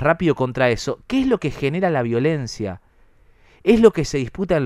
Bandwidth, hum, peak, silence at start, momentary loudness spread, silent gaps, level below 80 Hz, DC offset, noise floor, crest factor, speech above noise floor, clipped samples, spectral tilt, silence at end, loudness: 12.5 kHz; none; 0 dBFS; 0 s; 11 LU; none; -42 dBFS; under 0.1%; -52 dBFS; 20 dB; 34 dB; under 0.1%; -6.5 dB/octave; 0 s; -20 LUFS